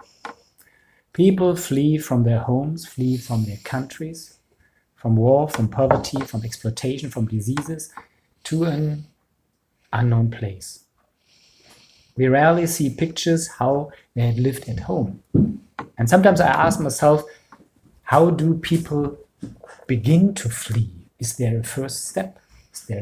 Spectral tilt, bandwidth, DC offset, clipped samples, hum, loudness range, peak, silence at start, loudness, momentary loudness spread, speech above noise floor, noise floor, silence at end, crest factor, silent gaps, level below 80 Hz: -6 dB/octave; 16 kHz; under 0.1%; under 0.1%; none; 7 LU; 0 dBFS; 0.25 s; -21 LUFS; 18 LU; 49 dB; -69 dBFS; 0 s; 20 dB; none; -48 dBFS